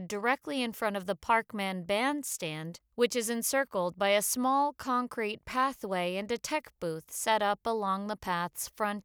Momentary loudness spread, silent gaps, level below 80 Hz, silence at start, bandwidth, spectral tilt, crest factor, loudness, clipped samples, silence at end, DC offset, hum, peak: 8 LU; none; -66 dBFS; 0 s; over 20 kHz; -3 dB/octave; 18 dB; -31 LUFS; under 0.1%; 0.05 s; under 0.1%; none; -12 dBFS